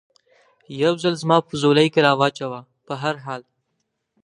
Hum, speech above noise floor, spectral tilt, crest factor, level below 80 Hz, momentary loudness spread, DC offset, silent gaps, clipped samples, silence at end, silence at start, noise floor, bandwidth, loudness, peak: none; 55 dB; -5.5 dB/octave; 20 dB; -66 dBFS; 17 LU; under 0.1%; none; under 0.1%; 0.85 s; 0.7 s; -75 dBFS; 11 kHz; -19 LUFS; -2 dBFS